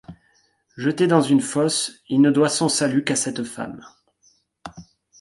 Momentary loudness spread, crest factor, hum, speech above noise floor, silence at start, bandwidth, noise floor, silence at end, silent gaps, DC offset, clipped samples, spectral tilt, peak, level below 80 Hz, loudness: 24 LU; 18 dB; none; 43 dB; 0.1 s; 11.5 kHz; -63 dBFS; 0.4 s; none; under 0.1%; under 0.1%; -4.5 dB/octave; -4 dBFS; -62 dBFS; -20 LUFS